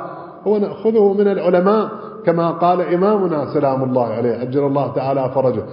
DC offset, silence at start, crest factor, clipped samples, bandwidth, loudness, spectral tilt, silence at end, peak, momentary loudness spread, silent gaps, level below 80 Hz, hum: under 0.1%; 0 s; 16 dB; under 0.1%; 5.4 kHz; -17 LUFS; -13 dB/octave; 0 s; -2 dBFS; 5 LU; none; -58 dBFS; none